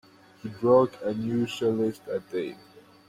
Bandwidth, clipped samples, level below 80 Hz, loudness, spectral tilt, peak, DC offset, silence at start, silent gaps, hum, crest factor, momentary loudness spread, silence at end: 15 kHz; under 0.1%; -66 dBFS; -26 LUFS; -7 dB/octave; -8 dBFS; under 0.1%; 0.45 s; none; none; 18 dB; 15 LU; 0.55 s